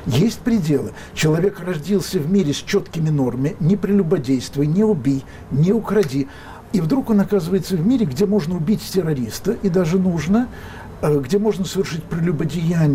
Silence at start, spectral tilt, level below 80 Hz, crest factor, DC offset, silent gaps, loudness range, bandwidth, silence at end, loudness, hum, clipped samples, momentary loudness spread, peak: 0 s; -7 dB/octave; -42 dBFS; 12 dB; under 0.1%; none; 1 LU; 16 kHz; 0 s; -19 LUFS; none; under 0.1%; 6 LU; -8 dBFS